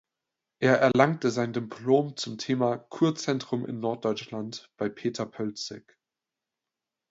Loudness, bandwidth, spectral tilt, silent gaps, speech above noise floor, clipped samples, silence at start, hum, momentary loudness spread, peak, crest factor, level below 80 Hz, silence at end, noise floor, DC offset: -28 LUFS; 8 kHz; -5.5 dB/octave; none; 61 dB; under 0.1%; 0.6 s; none; 13 LU; -4 dBFS; 24 dB; -70 dBFS; 1.3 s; -88 dBFS; under 0.1%